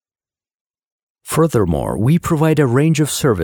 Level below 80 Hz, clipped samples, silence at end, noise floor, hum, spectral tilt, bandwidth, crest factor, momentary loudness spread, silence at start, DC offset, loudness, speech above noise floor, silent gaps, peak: -38 dBFS; under 0.1%; 0 s; under -90 dBFS; none; -6 dB/octave; 19.5 kHz; 14 dB; 4 LU; 1.25 s; under 0.1%; -16 LUFS; over 76 dB; none; -2 dBFS